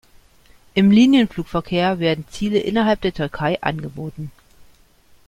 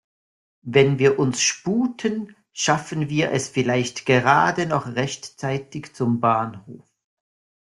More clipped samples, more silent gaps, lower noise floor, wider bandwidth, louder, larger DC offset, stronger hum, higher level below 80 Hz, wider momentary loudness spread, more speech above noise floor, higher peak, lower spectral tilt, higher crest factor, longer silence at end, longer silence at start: neither; neither; second, -52 dBFS vs under -90 dBFS; about the same, 11.5 kHz vs 11.5 kHz; about the same, -19 LUFS vs -21 LUFS; neither; neither; first, -46 dBFS vs -60 dBFS; first, 18 LU vs 12 LU; second, 34 dB vs over 69 dB; about the same, -2 dBFS vs -2 dBFS; first, -6.5 dB/octave vs -4.5 dB/octave; about the same, 18 dB vs 20 dB; second, 0.65 s vs 0.95 s; about the same, 0.75 s vs 0.65 s